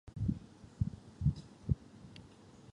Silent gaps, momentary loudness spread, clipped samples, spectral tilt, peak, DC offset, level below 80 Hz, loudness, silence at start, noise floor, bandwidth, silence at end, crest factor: none; 20 LU; under 0.1%; -8.5 dB/octave; -18 dBFS; under 0.1%; -48 dBFS; -39 LUFS; 0.05 s; -57 dBFS; 10 kHz; 0.15 s; 22 dB